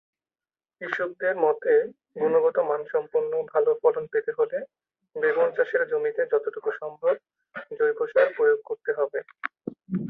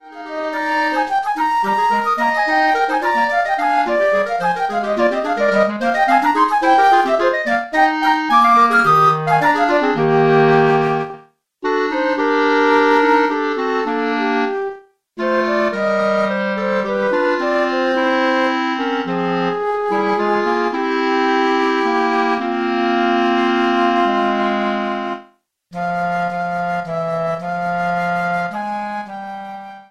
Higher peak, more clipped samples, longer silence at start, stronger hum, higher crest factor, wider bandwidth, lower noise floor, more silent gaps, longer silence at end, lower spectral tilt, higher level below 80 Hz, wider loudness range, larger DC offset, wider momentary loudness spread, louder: second, -6 dBFS vs 0 dBFS; neither; first, 0.8 s vs 0.05 s; neither; about the same, 18 dB vs 16 dB; second, 4.1 kHz vs 13.5 kHz; first, under -90 dBFS vs -51 dBFS; neither; about the same, 0 s vs 0.1 s; first, -8 dB/octave vs -6 dB/octave; second, -76 dBFS vs -58 dBFS; second, 2 LU vs 7 LU; second, under 0.1% vs 0.3%; first, 13 LU vs 9 LU; second, -25 LUFS vs -16 LUFS